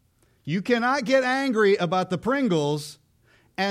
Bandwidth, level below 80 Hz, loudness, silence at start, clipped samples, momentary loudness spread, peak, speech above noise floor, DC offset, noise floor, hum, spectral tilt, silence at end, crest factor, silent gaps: 15 kHz; -64 dBFS; -23 LUFS; 0.45 s; under 0.1%; 11 LU; -8 dBFS; 38 dB; under 0.1%; -61 dBFS; none; -5.5 dB/octave; 0 s; 16 dB; none